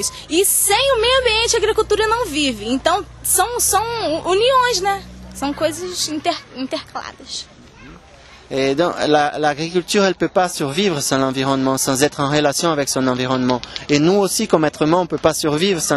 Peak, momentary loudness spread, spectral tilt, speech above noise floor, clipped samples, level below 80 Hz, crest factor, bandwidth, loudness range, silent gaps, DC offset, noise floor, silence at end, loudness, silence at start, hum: 0 dBFS; 11 LU; -3 dB/octave; 26 dB; under 0.1%; -44 dBFS; 18 dB; 13.5 kHz; 7 LU; none; under 0.1%; -43 dBFS; 0 s; -17 LUFS; 0 s; none